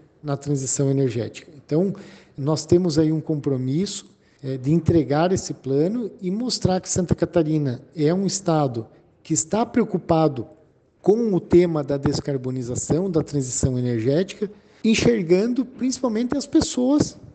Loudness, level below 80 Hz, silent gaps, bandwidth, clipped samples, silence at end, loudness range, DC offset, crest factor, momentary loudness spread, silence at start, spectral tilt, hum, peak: -22 LUFS; -48 dBFS; none; 9.2 kHz; under 0.1%; 0.1 s; 2 LU; under 0.1%; 18 dB; 9 LU; 0.25 s; -6 dB/octave; none; -4 dBFS